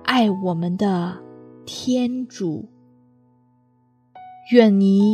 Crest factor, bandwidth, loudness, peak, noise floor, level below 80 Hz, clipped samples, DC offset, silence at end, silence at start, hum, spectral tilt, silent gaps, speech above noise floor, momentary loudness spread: 20 dB; 9.6 kHz; -20 LUFS; 0 dBFS; -60 dBFS; -68 dBFS; under 0.1%; under 0.1%; 0 s; 0.05 s; none; -6.5 dB/octave; none; 42 dB; 19 LU